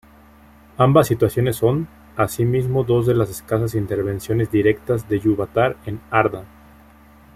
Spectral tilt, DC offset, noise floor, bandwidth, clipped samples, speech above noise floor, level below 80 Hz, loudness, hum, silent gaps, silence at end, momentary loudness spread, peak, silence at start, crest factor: -7 dB/octave; under 0.1%; -48 dBFS; 15.5 kHz; under 0.1%; 29 dB; -46 dBFS; -19 LUFS; none; none; 0.9 s; 8 LU; -2 dBFS; 0.8 s; 18 dB